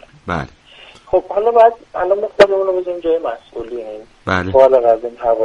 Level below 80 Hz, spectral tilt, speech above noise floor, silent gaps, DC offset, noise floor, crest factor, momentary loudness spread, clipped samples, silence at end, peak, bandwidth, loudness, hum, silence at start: -44 dBFS; -6.5 dB/octave; 27 dB; none; under 0.1%; -42 dBFS; 16 dB; 17 LU; under 0.1%; 0 s; 0 dBFS; 10.5 kHz; -15 LUFS; none; 0.25 s